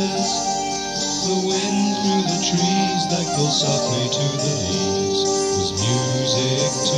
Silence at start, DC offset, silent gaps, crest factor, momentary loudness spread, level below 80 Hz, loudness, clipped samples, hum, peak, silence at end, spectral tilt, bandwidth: 0 s; under 0.1%; none; 14 dB; 3 LU; -52 dBFS; -20 LUFS; under 0.1%; none; -6 dBFS; 0 s; -3.5 dB/octave; 12.5 kHz